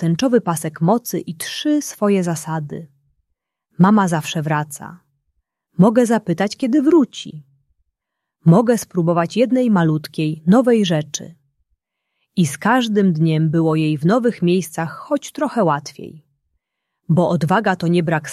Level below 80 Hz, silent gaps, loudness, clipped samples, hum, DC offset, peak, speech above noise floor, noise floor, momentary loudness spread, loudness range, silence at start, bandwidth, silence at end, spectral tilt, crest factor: -60 dBFS; none; -17 LUFS; under 0.1%; none; under 0.1%; -2 dBFS; 64 dB; -80 dBFS; 12 LU; 4 LU; 0 s; 14 kHz; 0 s; -6.5 dB/octave; 16 dB